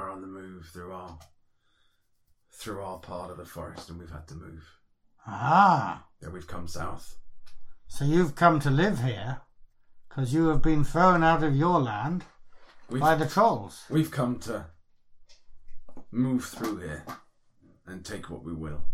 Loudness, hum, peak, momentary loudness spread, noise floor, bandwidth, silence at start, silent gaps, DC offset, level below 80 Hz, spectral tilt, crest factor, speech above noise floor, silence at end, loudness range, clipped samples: -26 LUFS; none; -6 dBFS; 22 LU; -67 dBFS; 15 kHz; 0 s; none; under 0.1%; -42 dBFS; -6.5 dB/octave; 22 dB; 41 dB; 0 s; 17 LU; under 0.1%